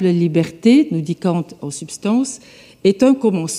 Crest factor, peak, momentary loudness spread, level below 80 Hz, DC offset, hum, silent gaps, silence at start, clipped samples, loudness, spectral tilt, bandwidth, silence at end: 14 dB; -2 dBFS; 14 LU; -60 dBFS; under 0.1%; none; none; 0 s; under 0.1%; -17 LUFS; -6 dB/octave; 13 kHz; 0 s